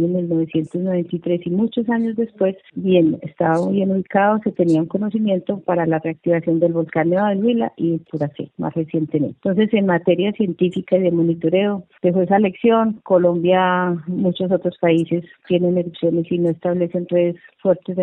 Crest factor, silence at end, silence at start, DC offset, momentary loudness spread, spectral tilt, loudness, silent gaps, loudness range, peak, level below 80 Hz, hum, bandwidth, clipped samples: 14 dB; 0 s; 0 s; under 0.1%; 6 LU; -9 dB/octave; -19 LUFS; none; 3 LU; -4 dBFS; -62 dBFS; none; 7.8 kHz; under 0.1%